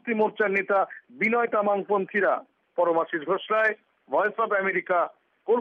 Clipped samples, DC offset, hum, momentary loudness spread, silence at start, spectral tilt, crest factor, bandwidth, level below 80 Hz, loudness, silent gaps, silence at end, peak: under 0.1%; under 0.1%; none; 8 LU; 0.05 s; -7 dB/octave; 14 dB; 6.8 kHz; -78 dBFS; -25 LUFS; none; 0 s; -12 dBFS